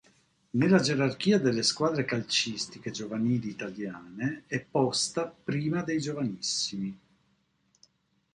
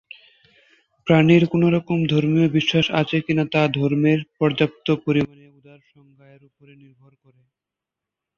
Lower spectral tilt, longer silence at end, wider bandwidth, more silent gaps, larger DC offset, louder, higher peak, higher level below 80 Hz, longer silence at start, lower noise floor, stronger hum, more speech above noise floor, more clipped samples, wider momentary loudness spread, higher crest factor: second, -4.5 dB/octave vs -7.5 dB/octave; second, 1.4 s vs 3.1 s; first, 11.5 kHz vs 7 kHz; neither; neither; second, -29 LUFS vs -19 LUFS; second, -10 dBFS vs -2 dBFS; second, -66 dBFS vs -58 dBFS; second, 0.55 s vs 1.05 s; second, -71 dBFS vs -86 dBFS; neither; second, 43 dB vs 67 dB; neither; first, 13 LU vs 7 LU; about the same, 20 dB vs 18 dB